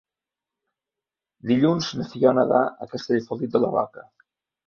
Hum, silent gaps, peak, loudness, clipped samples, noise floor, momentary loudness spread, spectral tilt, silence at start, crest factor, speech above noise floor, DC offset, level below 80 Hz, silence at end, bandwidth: none; none; -4 dBFS; -22 LUFS; under 0.1%; -89 dBFS; 11 LU; -6.5 dB/octave; 1.45 s; 20 dB; 67 dB; under 0.1%; -66 dBFS; 0.65 s; 7 kHz